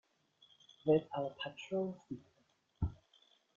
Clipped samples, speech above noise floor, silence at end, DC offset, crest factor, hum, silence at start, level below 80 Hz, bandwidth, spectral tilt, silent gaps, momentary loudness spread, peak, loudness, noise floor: under 0.1%; 38 dB; 0.65 s; under 0.1%; 22 dB; none; 0.85 s; -58 dBFS; 7.2 kHz; -6 dB/octave; none; 16 LU; -20 dBFS; -39 LUFS; -75 dBFS